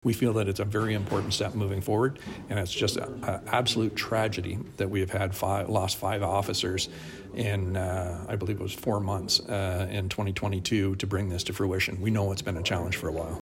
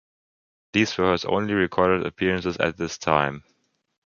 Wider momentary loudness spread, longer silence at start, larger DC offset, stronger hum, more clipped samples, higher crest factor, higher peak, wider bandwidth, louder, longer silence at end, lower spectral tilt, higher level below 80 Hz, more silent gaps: about the same, 7 LU vs 5 LU; second, 0.05 s vs 0.75 s; neither; neither; neither; about the same, 18 dB vs 22 dB; second, -10 dBFS vs -2 dBFS; first, 16.5 kHz vs 7.2 kHz; second, -29 LUFS vs -23 LUFS; second, 0 s vs 0.7 s; about the same, -5 dB/octave vs -5 dB/octave; about the same, -50 dBFS vs -50 dBFS; neither